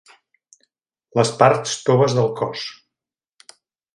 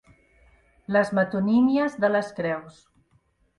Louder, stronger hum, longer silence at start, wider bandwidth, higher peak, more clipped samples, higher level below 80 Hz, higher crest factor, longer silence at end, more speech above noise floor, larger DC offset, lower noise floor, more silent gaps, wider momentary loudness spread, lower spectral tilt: first, -19 LUFS vs -23 LUFS; neither; first, 1.15 s vs 0.9 s; about the same, 11.5 kHz vs 11 kHz; first, 0 dBFS vs -8 dBFS; neither; about the same, -64 dBFS vs -62 dBFS; about the same, 22 dB vs 18 dB; first, 1.25 s vs 0.9 s; first, 70 dB vs 42 dB; neither; first, -88 dBFS vs -65 dBFS; neither; about the same, 11 LU vs 9 LU; second, -5 dB/octave vs -7.5 dB/octave